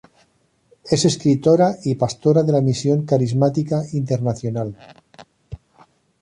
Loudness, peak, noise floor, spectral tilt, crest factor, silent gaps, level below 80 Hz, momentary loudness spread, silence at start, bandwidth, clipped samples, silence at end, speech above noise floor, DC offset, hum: -19 LUFS; -4 dBFS; -62 dBFS; -6.5 dB/octave; 16 dB; none; -52 dBFS; 14 LU; 0.85 s; 11 kHz; under 0.1%; 0.65 s; 44 dB; under 0.1%; none